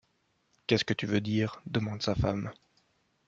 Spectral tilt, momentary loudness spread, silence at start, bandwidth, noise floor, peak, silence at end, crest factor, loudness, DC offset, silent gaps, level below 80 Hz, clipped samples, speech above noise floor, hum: -6 dB/octave; 8 LU; 0.7 s; 7.6 kHz; -74 dBFS; -10 dBFS; 0.75 s; 22 dB; -31 LUFS; under 0.1%; none; -50 dBFS; under 0.1%; 44 dB; none